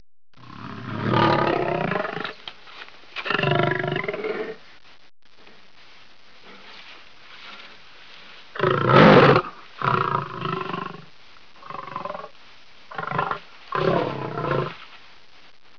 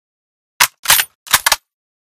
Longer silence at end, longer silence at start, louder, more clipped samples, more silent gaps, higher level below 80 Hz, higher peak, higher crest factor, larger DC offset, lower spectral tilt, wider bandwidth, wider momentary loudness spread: first, 0.8 s vs 0.55 s; second, 0.45 s vs 0.6 s; second, -22 LUFS vs -13 LUFS; second, under 0.1% vs 0.2%; second, none vs 0.79-0.83 s, 1.15-1.26 s; second, -54 dBFS vs -48 dBFS; about the same, -2 dBFS vs 0 dBFS; first, 24 dB vs 18 dB; first, 0.5% vs under 0.1%; first, -7.5 dB/octave vs 2 dB/octave; second, 5.4 kHz vs over 20 kHz; first, 25 LU vs 4 LU